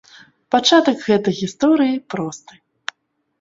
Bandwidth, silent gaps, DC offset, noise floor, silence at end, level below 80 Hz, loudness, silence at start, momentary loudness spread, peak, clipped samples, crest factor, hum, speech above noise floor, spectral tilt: 7.8 kHz; none; under 0.1%; -67 dBFS; 1.05 s; -62 dBFS; -17 LUFS; 0.5 s; 19 LU; 0 dBFS; under 0.1%; 18 dB; none; 51 dB; -4.5 dB/octave